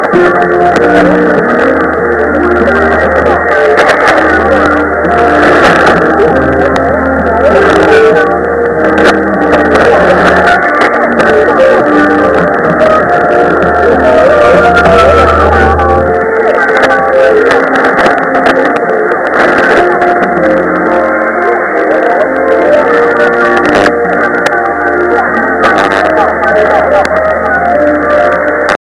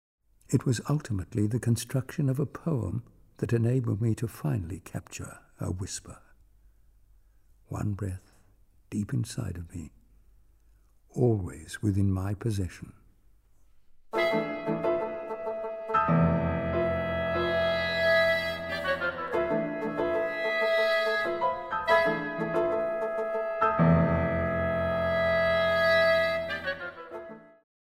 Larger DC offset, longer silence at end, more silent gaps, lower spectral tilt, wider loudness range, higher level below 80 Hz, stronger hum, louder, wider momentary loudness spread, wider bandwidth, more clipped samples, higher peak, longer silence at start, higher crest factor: first, 0.1% vs under 0.1%; second, 0.05 s vs 0.35 s; neither; about the same, -6 dB/octave vs -6 dB/octave; second, 2 LU vs 11 LU; first, -28 dBFS vs -52 dBFS; neither; first, -7 LUFS vs -28 LUFS; second, 4 LU vs 14 LU; second, 11.5 kHz vs 16 kHz; first, 2% vs under 0.1%; first, 0 dBFS vs -10 dBFS; second, 0 s vs 0.5 s; second, 6 dB vs 18 dB